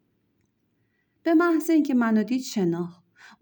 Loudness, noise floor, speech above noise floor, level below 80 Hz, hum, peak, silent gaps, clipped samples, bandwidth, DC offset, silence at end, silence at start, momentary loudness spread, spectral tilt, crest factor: -23 LUFS; -71 dBFS; 49 dB; -78 dBFS; none; -12 dBFS; none; under 0.1%; over 20 kHz; under 0.1%; 0.5 s; 1.25 s; 11 LU; -6 dB/octave; 14 dB